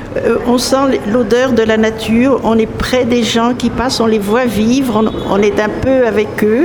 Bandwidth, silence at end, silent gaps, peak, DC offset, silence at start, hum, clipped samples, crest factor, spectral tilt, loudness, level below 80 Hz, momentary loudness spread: 20 kHz; 0 s; none; 0 dBFS; under 0.1%; 0 s; none; under 0.1%; 12 dB; -5 dB/octave; -12 LUFS; -34 dBFS; 3 LU